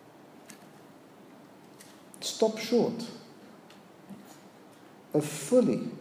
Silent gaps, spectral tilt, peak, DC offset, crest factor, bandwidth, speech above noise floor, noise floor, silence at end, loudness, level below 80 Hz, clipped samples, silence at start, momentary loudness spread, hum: none; -5 dB/octave; -12 dBFS; under 0.1%; 20 dB; 16 kHz; 26 dB; -53 dBFS; 0 s; -29 LUFS; -82 dBFS; under 0.1%; 0.5 s; 27 LU; none